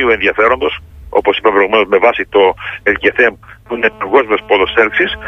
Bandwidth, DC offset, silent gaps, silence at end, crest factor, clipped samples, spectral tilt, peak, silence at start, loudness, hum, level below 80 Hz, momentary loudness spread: 6.6 kHz; under 0.1%; none; 0 s; 12 dB; under 0.1%; -5.5 dB/octave; 0 dBFS; 0 s; -12 LUFS; none; -40 dBFS; 6 LU